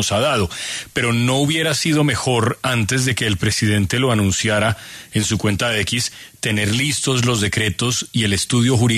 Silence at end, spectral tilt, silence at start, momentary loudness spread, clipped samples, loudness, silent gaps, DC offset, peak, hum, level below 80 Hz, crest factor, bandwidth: 0 s; -4 dB/octave; 0 s; 5 LU; under 0.1%; -18 LUFS; none; under 0.1%; -4 dBFS; none; -44 dBFS; 14 dB; 13.5 kHz